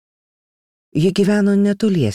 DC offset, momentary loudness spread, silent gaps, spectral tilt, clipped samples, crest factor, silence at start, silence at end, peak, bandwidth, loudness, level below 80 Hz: under 0.1%; 4 LU; none; -7 dB/octave; under 0.1%; 12 dB; 0.95 s; 0 s; -6 dBFS; 11.5 kHz; -16 LUFS; -56 dBFS